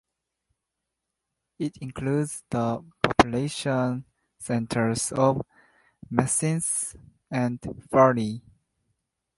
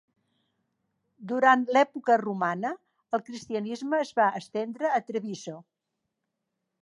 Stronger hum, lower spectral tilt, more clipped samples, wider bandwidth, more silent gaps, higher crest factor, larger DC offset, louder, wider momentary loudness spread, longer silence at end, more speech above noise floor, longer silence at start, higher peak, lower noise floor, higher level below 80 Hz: neither; about the same, -5 dB/octave vs -5 dB/octave; neither; about the same, 12 kHz vs 11 kHz; neither; about the same, 26 dB vs 22 dB; neither; about the same, -26 LUFS vs -27 LUFS; second, 13 LU vs 16 LU; second, 1 s vs 1.2 s; about the same, 58 dB vs 57 dB; first, 1.6 s vs 1.2 s; first, -2 dBFS vs -8 dBFS; about the same, -84 dBFS vs -83 dBFS; first, -52 dBFS vs -80 dBFS